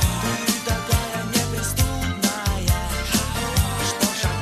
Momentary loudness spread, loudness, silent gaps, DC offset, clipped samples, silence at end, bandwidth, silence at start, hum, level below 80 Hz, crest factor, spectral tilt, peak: 2 LU; -22 LUFS; none; under 0.1%; under 0.1%; 0 s; 14.5 kHz; 0 s; none; -30 dBFS; 16 dB; -4 dB/octave; -6 dBFS